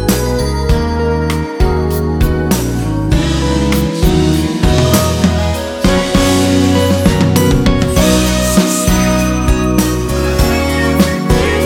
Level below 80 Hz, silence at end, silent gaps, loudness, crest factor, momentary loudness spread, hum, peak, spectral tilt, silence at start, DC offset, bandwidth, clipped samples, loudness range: -18 dBFS; 0 s; none; -13 LUFS; 12 dB; 4 LU; none; 0 dBFS; -5.5 dB/octave; 0 s; under 0.1%; 18 kHz; under 0.1%; 3 LU